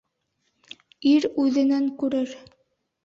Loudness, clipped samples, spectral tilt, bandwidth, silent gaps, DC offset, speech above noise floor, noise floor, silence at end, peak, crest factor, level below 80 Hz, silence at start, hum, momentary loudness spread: -23 LUFS; under 0.1%; -4.5 dB/octave; 7.4 kHz; none; under 0.1%; 53 dB; -74 dBFS; 0.65 s; -10 dBFS; 14 dB; -70 dBFS; 1 s; none; 7 LU